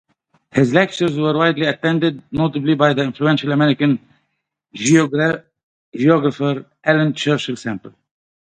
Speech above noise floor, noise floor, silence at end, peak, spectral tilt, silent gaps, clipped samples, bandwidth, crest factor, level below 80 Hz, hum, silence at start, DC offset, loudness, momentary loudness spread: 56 dB; -73 dBFS; 0.55 s; 0 dBFS; -5.5 dB/octave; 5.63-5.92 s; under 0.1%; 9.4 kHz; 18 dB; -56 dBFS; none; 0.55 s; under 0.1%; -17 LUFS; 8 LU